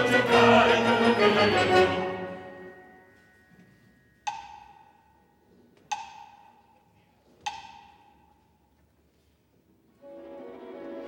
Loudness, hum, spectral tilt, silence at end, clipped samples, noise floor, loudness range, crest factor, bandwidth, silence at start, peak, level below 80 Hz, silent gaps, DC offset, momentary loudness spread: -23 LUFS; none; -4.5 dB/octave; 0 s; under 0.1%; -66 dBFS; 23 LU; 22 dB; 15.5 kHz; 0 s; -6 dBFS; -60 dBFS; none; under 0.1%; 26 LU